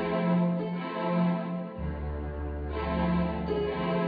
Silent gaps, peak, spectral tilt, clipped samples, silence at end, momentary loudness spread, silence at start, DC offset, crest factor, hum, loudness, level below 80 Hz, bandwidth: none; -16 dBFS; -10.5 dB/octave; under 0.1%; 0 s; 9 LU; 0 s; under 0.1%; 12 dB; none; -30 LUFS; -40 dBFS; 5 kHz